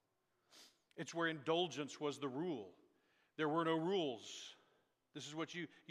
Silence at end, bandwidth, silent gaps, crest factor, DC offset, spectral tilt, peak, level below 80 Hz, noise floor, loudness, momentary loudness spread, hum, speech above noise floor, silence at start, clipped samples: 0.15 s; 12 kHz; none; 20 dB; under 0.1%; -4.5 dB/octave; -24 dBFS; under -90 dBFS; -83 dBFS; -42 LUFS; 17 LU; none; 41 dB; 0.55 s; under 0.1%